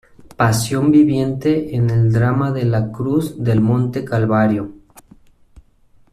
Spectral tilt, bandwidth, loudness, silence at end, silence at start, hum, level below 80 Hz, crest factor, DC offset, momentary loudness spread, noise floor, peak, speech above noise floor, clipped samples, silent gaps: -7 dB/octave; 14 kHz; -17 LUFS; 1.4 s; 0.25 s; none; -46 dBFS; 14 dB; under 0.1%; 6 LU; -51 dBFS; -2 dBFS; 36 dB; under 0.1%; none